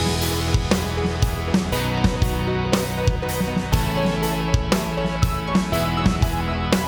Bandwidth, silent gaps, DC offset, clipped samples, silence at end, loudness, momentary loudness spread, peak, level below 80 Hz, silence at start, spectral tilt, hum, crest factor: over 20 kHz; none; under 0.1%; under 0.1%; 0 s; -22 LUFS; 3 LU; -2 dBFS; -28 dBFS; 0 s; -5.5 dB/octave; none; 18 dB